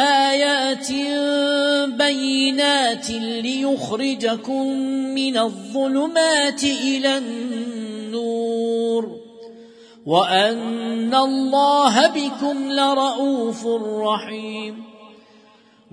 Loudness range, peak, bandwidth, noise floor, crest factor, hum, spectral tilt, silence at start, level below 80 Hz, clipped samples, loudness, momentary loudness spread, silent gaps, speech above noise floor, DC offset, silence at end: 5 LU; -2 dBFS; 10.5 kHz; -52 dBFS; 18 dB; none; -3 dB/octave; 0 s; -66 dBFS; under 0.1%; -20 LUFS; 10 LU; none; 32 dB; under 0.1%; 0.8 s